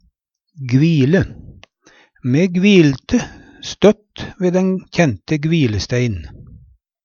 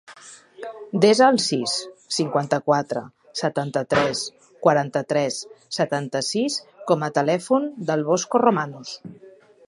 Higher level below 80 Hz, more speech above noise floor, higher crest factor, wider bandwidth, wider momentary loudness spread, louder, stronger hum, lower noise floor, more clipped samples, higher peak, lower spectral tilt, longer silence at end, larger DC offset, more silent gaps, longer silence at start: first, -42 dBFS vs -64 dBFS; first, 49 dB vs 24 dB; about the same, 16 dB vs 20 dB; second, 7.2 kHz vs 11.5 kHz; first, 17 LU vs 14 LU; first, -16 LUFS vs -22 LUFS; neither; first, -64 dBFS vs -46 dBFS; neither; about the same, 0 dBFS vs -2 dBFS; first, -6.5 dB/octave vs -4.5 dB/octave; about the same, 0.45 s vs 0.4 s; neither; neither; first, 0.6 s vs 0.1 s